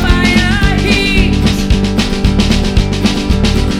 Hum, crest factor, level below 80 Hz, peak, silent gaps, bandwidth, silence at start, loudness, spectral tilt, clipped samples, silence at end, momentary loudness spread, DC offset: none; 10 dB; -16 dBFS; 0 dBFS; none; 15.5 kHz; 0 s; -12 LUFS; -5.5 dB/octave; under 0.1%; 0 s; 3 LU; 0.3%